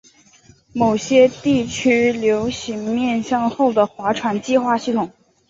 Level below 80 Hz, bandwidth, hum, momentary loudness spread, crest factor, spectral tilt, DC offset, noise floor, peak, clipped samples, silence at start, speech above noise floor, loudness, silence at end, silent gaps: -52 dBFS; 7.8 kHz; none; 8 LU; 16 dB; -5 dB/octave; under 0.1%; -51 dBFS; -2 dBFS; under 0.1%; 0.75 s; 33 dB; -18 LUFS; 0.4 s; none